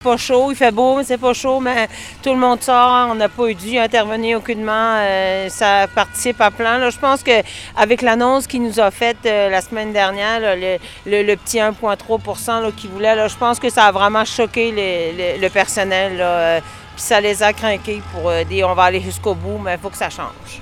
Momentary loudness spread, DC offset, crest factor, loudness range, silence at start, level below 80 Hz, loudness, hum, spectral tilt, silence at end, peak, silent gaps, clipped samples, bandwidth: 9 LU; under 0.1%; 16 dB; 3 LU; 0 s; -44 dBFS; -16 LUFS; none; -3.5 dB/octave; 0 s; 0 dBFS; none; under 0.1%; 17.5 kHz